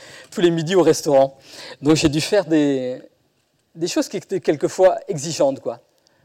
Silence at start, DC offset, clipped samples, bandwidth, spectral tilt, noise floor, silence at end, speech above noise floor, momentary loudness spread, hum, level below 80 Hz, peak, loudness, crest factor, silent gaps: 0 s; under 0.1%; under 0.1%; 16 kHz; -5 dB/octave; -65 dBFS; 0.5 s; 46 dB; 14 LU; none; -52 dBFS; -6 dBFS; -19 LUFS; 14 dB; none